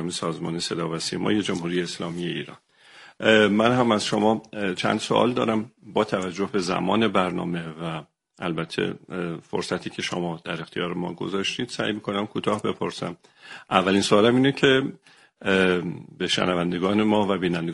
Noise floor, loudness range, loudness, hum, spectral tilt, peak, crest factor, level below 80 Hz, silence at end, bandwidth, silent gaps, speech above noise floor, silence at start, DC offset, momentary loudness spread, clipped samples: -50 dBFS; 7 LU; -24 LUFS; none; -5 dB/octave; 0 dBFS; 24 dB; -60 dBFS; 0 s; 11.5 kHz; none; 26 dB; 0 s; under 0.1%; 12 LU; under 0.1%